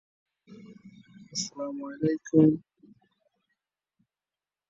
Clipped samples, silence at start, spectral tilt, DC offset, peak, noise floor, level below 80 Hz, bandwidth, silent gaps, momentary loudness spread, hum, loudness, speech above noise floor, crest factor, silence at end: under 0.1%; 0.5 s; -6 dB/octave; under 0.1%; -8 dBFS; under -90 dBFS; -72 dBFS; 7.8 kHz; none; 14 LU; none; -27 LUFS; over 63 dB; 24 dB; 2.1 s